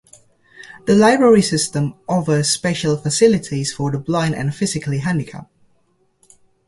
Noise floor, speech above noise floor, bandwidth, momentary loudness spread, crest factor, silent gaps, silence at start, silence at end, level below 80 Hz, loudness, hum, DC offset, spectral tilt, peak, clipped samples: -61 dBFS; 45 dB; 11.5 kHz; 11 LU; 16 dB; none; 0.6 s; 1.25 s; -52 dBFS; -17 LUFS; none; under 0.1%; -5 dB/octave; -2 dBFS; under 0.1%